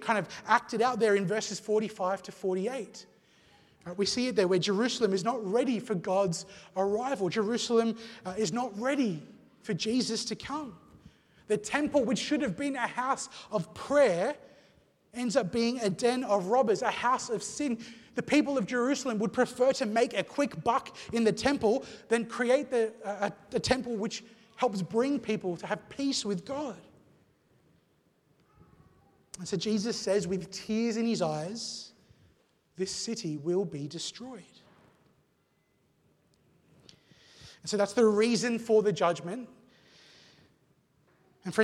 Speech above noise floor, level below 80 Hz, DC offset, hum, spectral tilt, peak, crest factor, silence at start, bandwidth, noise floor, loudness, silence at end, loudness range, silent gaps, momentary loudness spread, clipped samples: 42 dB; -66 dBFS; under 0.1%; none; -4.5 dB/octave; -10 dBFS; 22 dB; 0 s; 13 kHz; -72 dBFS; -30 LUFS; 0 s; 8 LU; none; 12 LU; under 0.1%